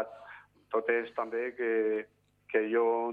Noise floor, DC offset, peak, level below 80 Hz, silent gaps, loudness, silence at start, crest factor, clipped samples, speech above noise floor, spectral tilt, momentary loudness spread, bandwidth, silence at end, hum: -53 dBFS; under 0.1%; -14 dBFS; -80 dBFS; none; -31 LUFS; 0 s; 18 dB; under 0.1%; 23 dB; -7 dB/octave; 17 LU; 4.4 kHz; 0 s; 50 Hz at -75 dBFS